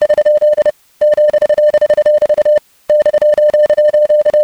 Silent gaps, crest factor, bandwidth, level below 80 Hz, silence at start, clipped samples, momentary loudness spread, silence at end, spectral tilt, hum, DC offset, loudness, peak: none; 8 dB; 8.2 kHz; -50 dBFS; 0 s; under 0.1%; 4 LU; 0 s; -4 dB/octave; none; under 0.1%; -11 LUFS; -2 dBFS